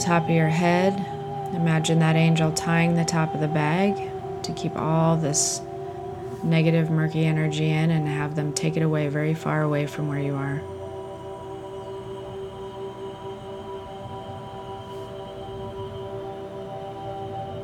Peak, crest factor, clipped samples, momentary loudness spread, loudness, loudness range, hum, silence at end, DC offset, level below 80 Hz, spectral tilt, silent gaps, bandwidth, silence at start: -6 dBFS; 18 dB; under 0.1%; 16 LU; -24 LUFS; 14 LU; none; 0 s; under 0.1%; -54 dBFS; -5.5 dB/octave; none; 12.5 kHz; 0 s